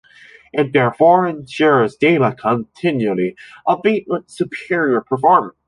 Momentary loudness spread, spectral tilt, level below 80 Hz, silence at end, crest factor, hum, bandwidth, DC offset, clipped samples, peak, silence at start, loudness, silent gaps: 11 LU; -7 dB/octave; -60 dBFS; 0.15 s; 16 dB; none; 11.5 kHz; under 0.1%; under 0.1%; 0 dBFS; 0.55 s; -17 LUFS; none